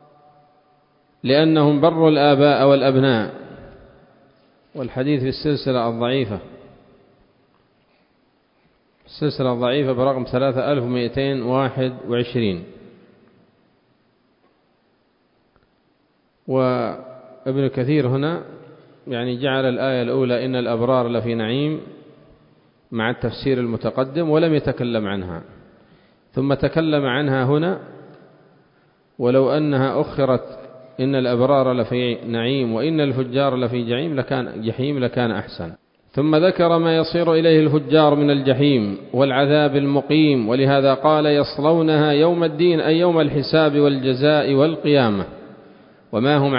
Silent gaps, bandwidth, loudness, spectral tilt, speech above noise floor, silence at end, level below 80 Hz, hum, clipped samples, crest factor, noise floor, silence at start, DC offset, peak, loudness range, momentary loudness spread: none; 5.4 kHz; -19 LUFS; -12 dB/octave; 45 dB; 0 s; -52 dBFS; none; under 0.1%; 18 dB; -63 dBFS; 1.25 s; under 0.1%; -2 dBFS; 9 LU; 11 LU